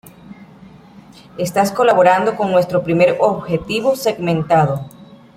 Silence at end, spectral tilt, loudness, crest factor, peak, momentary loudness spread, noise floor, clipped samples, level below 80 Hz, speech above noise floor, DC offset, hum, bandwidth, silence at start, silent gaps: 0.2 s; -6 dB/octave; -16 LUFS; 16 dB; -2 dBFS; 10 LU; -42 dBFS; under 0.1%; -50 dBFS; 27 dB; under 0.1%; none; 16 kHz; 0.05 s; none